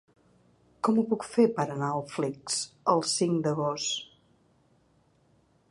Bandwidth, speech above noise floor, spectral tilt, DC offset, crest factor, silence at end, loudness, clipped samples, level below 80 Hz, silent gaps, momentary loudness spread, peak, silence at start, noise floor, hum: 11.5 kHz; 38 dB; -4.5 dB/octave; under 0.1%; 20 dB; 1.65 s; -28 LUFS; under 0.1%; -72 dBFS; none; 7 LU; -10 dBFS; 0.85 s; -66 dBFS; none